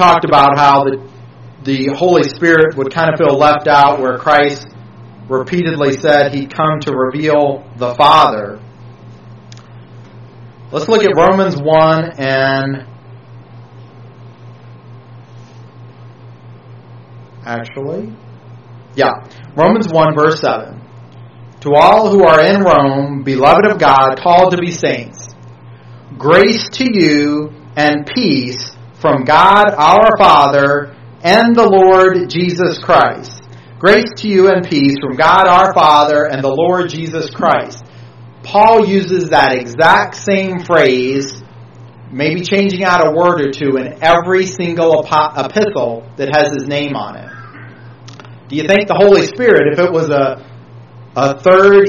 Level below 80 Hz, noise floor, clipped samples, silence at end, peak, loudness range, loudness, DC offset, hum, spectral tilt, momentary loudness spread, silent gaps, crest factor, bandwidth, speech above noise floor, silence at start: -46 dBFS; -36 dBFS; 0.4%; 0 s; 0 dBFS; 7 LU; -11 LUFS; under 0.1%; none; -5.5 dB/octave; 15 LU; none; 12 dB; 9.2 kHz; 25 dB; 0 s